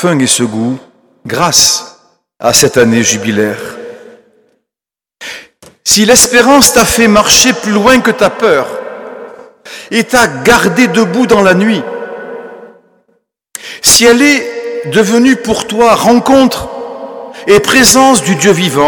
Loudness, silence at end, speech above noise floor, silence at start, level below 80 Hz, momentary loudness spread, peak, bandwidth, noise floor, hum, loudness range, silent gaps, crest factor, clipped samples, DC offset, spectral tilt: -7 LUFS; 0 s; 80 dB; 0 s; -38 dBFS; 21 LU; 0 dBFS; over 20 kHz; -88 dBFS; none; 6 LU; none; 10 dB; 0.9%; under 0.1%; -3 dB/octave